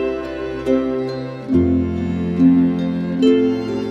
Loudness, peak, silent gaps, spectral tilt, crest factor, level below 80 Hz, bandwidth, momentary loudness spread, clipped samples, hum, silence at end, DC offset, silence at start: -18 LUFS; -4 dBFS; none; -8.5 dB/octave; 14 dB; -42 dBFS; 7.6 kHz; 11 LU; under 0.1%; none; 0 s; under 0.1%; 0 s